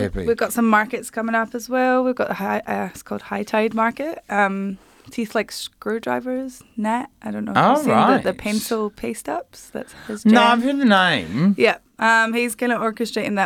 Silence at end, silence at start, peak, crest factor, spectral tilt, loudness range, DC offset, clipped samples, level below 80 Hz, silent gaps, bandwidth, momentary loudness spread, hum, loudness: 0 s; 0 s; -2 dBFS; 18 dB; -5 dB/octave; 6 LU; under 0.1%; under 0.1%; -50 dBFS; none; 16.5 kHz; 13 LU; none; -20 LUFS